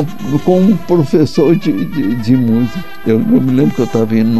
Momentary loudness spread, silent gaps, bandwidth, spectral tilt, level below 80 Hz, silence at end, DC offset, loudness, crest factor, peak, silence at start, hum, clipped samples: 6 LU; none; 13 kHz; -8 dB/octave; -42 dBFS; 0 s; 6%; -13 LUFS; 12 dB; 0 dBFS; 0 s; none; under 0.1%